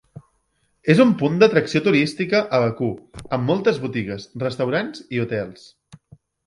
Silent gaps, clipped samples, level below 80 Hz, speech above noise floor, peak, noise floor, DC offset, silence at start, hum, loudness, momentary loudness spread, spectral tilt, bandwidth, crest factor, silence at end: none; under 0.1%; -56 dBFS; 48 dB; 0 dBFS; -67 dBFS; under 0.1%; 0.15 s; none; -20 LUFS; 12 LU; -6.5 dB/octave; 11.5 kHz; 20 dB; 0.95 s